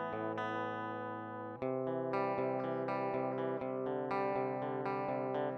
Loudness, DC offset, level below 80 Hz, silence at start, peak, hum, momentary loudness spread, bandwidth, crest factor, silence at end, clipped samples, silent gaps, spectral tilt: -38 LUFS; under 0.1%; -78 dBFS; 0 s; -22 dBFS; none; 5 LU; 6.4 kHz; 16 dB; 0 s; under 0.1%; none; -8.5 dB/octave